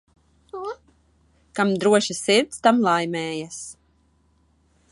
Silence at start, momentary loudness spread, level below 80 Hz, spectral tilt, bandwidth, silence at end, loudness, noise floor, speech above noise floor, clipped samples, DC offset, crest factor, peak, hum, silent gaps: 0.55 s; 18 LU; -62 dBFS; -4 dB/octave; 11.5 kHz; 1.2 s; -21 LUFS; -62 dBFS; 41 dB; under 0.1%; under 0.1%; 20 dB; -4 dBFS; none; none